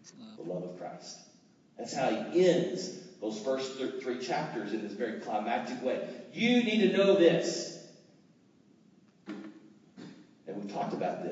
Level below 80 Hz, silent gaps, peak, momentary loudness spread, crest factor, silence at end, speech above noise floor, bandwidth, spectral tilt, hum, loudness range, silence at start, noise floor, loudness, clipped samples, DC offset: -86 dBFS; none; -10 dBFS; 21 LU; 22 dB; 0 s; 33 dB; 8 kHz; -5 dB/octave; none; 12 LU; 0.05 s; -63 dBFS; -31 LUFS; under 0.1%; under 0.1%